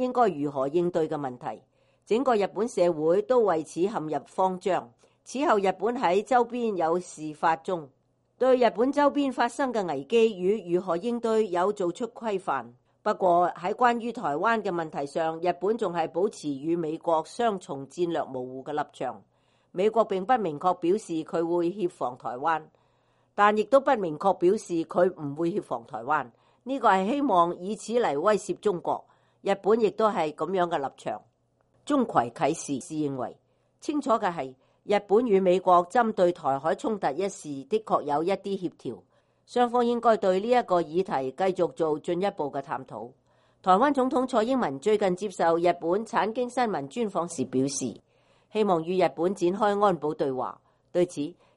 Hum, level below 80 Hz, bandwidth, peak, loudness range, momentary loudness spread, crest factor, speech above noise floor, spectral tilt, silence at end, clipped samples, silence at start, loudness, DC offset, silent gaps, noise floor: none; -68 dBFS; 11.5 kHz; -6 dBFS; 4 LU; 11 LU; 20 dB; 43 dB; -5.5 dB/octave; 0.25 s; under 0.1%; 0 s; -26 LUFS; under 0.1%; none; -68 dBFS